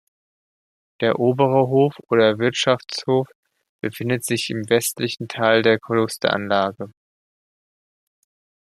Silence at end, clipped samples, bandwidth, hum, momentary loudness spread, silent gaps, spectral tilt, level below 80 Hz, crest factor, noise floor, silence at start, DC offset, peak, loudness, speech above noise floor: 1.75 s; under 0.1%; 15 kHz; none; 9 LU; 3.35-3.43 s, 3.69-3.79 s; -4.5 dB/octave; -64 dBFS; 20 dB; under -90 dBFS; 1 s; under 0.1%; -2 dBFS; -20 LUFS; over 70 dB